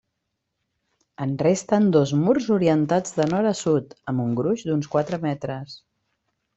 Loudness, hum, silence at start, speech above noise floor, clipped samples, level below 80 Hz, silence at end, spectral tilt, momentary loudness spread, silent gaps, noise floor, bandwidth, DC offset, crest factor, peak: -22 LUFS; none; 1.2 s; 57 dB; under 0.1%; -62 dBFS; 0.8 s; -6.5 dB/octave; 10 LU; none; -79 dBFS; 8.2 kHz; under 0.1%; 18 dB; -6 dBFS